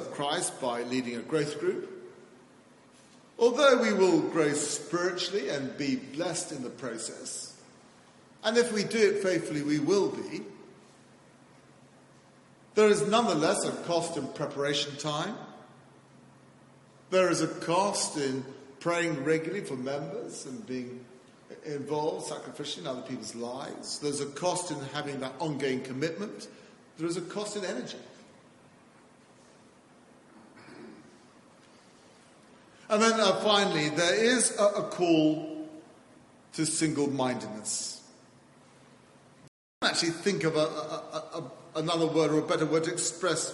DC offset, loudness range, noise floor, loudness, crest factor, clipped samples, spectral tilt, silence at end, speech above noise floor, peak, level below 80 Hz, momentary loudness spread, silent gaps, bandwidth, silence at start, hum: under 0.1%; 9 LU; -58 dBFS; -29 LUFS; 22 dB; under 0.1%; -3.5 dB/octave; 0 s; 29 dB; -8 dBFS; -76 dBFS; 15 LU; 39.48-39.81 s; 11.5 kHz; 0 s; none